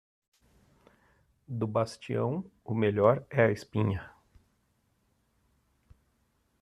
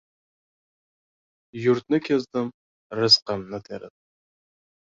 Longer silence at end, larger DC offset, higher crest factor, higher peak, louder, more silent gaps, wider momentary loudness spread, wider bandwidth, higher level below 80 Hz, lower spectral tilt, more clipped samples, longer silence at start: first, 2.55 s vs 0.95 s; neither; about the same, 24 dB vs 24 dB; second, -8 dBFS vs -4 dBFS; second, -30 LUFS vs -22 LUFS; second, none vs 2.54-2.90 s; second, 11 LU vs 20 LU; first, 11.5 kHz vs 7.6 kHz; about the same, -64 dBFS vs -66 dBFS; first, -7.5 dB/octave vs -4.5 dB/octave; neither; about the same, 1.5 s vs 1.55 s